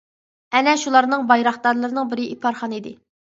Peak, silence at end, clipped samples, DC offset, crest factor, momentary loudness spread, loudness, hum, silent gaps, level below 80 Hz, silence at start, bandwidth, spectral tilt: 0 dBFS; 0.4 s; under 0.1%; under 0.1%; 20 dB; 12 LU; -19 LUFS; none; none; -72 dBFS; 0.5 s; 7.8 kHz; -3 dB/octave